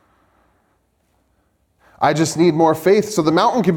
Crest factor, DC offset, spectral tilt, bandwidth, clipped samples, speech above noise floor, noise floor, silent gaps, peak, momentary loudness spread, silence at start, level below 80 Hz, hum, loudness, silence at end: 16 dB; under 0.1%; -5.5 dB/octave; 18.5 kHz; under 0.1%; 48 dB; -63 dBFS; none; -2 dBFS; 4 LU; 2 s; -58 dBFS; none; -16 LUFS; 0 s